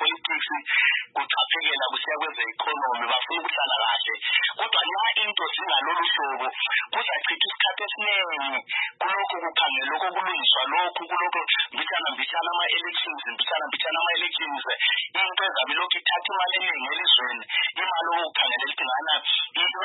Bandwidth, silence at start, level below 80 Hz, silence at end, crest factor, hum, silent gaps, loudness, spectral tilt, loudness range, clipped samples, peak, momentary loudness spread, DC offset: 4.1 kHz; 0 s; under -90 dBFS; 0 s; 18 dB; none; none; -23 LUFS; -3.5 dB/octave; 2 LU; under 0.1%; -8 dBFS; 5 LU; under 0.1%